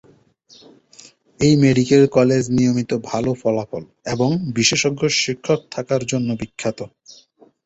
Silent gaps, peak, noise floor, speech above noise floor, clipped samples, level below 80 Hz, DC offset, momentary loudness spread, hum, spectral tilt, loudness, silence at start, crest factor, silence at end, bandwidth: none; -2 dBFS; -52 dBFS; 34 dB; under 0.1%; -52 dBFS; under 0.1%; 12 LU; none; -5 dB/octave; -18 LUFS; 1.4 s; 18 dB; 0.8 s; 8.2 kHz